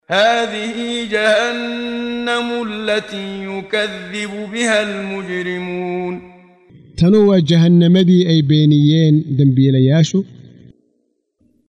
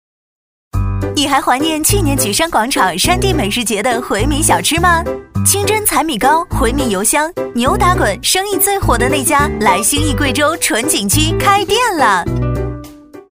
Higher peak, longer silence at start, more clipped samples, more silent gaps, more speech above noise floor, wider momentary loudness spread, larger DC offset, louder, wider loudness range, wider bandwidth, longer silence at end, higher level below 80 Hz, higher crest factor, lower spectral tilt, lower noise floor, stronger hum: about the same, -2 dBFS vs 0 dBFS; second, 0.1 s vs 0.75 s; neither; neither; first, 51 dB vs 21 dB; first, 13 LU vs 6 LU; second, under 0.1% vs 0.2%; about the same, -15 LUFS vs -13 LUFS; first, 9 LU vs 1 LU; second, 10.5 kHz vs 16 kHz; first, 1.3 s vs 0.1 s; second, -52 dBFS vs -26 dBFS; about the same, 14 dB vs 14 dB; first, -6.5 dB/octave vs -3.5 dB/octave; first, -65 dBFS vs -34 dBFS; neither